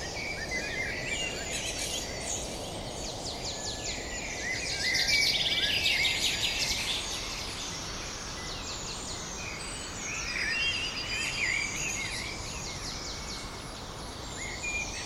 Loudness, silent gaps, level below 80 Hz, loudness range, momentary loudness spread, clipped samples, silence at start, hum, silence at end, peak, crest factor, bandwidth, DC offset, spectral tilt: -31 LUFS; none; -46 dBFS; 8 LU; 12 LU; under 0.1%; 0 s; none; 0 s; -14 dBFS; 20 dB; 16 kHz; under 0.1%; -1.5 dB/octave